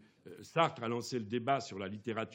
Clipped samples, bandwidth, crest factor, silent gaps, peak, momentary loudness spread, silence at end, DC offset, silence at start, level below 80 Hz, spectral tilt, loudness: under 0.1%; 16.5 kHz; 24 dB; none; -14 dBFS; 11 LU; 0 s; under 0.1%; 0.25 s; -86 dBFS; -5 dB/octave; -36 LUFS